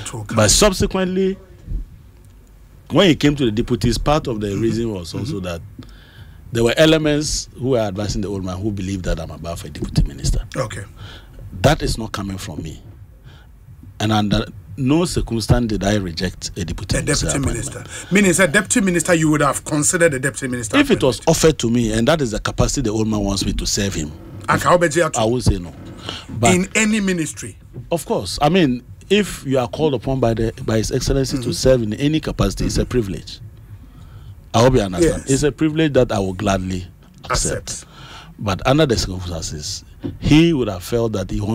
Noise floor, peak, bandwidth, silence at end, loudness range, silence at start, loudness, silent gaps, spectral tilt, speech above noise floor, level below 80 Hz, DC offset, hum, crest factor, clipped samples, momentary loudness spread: -44 dBFS; -2 dBFS; 16 kHz; 0 s; 6 LU; 0 s; -18 LUFS; none; -4.5 dB/octave; 26 dB; -32 dBFS; under 0.1%; none; 16 dB; under 0.1%; 15 LU